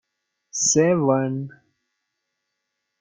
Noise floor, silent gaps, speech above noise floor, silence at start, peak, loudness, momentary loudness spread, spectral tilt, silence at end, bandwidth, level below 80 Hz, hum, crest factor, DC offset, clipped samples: -79 dBFS; none; 59 dB; 0.55 s; -6 dBFS; -20 LUFS; 15 LU; -4.5 dB/octave; 1.5 s; 10.5 kHz; -66 dBFS; none; 18 dB; under 0.1%; under 0.1%